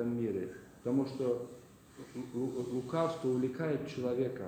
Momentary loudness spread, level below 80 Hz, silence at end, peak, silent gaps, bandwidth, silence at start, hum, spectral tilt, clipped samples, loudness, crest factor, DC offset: 12 LU; -70 dBFS; 0 s; -18 dBFS; none; 15.5 kHz; 0 s; none; -7.5 dB/octave; under 0.1%; -36 LUFS; 18 dB; under 0.1%